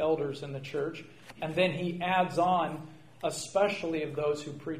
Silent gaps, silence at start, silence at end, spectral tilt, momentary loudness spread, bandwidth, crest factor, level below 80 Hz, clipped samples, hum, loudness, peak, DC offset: none; 0 s; 0 s; -5 dB/octave; 12 LU; 15.5 kHz; 18 dB; -66 dBFS; under 0.1%; none; -31 LUFS; -14 dBFS; 0.1%